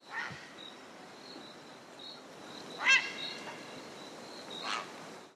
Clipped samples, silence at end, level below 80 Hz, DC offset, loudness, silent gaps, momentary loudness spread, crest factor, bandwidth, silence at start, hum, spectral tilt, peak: under 0.1%; 0 s; -86 dBFS; under 0.1%; -33 LUFS; none; 23 LU; 26 dB; 14 kHz; 0 s; none; -1 dB/octave; -12 dBFS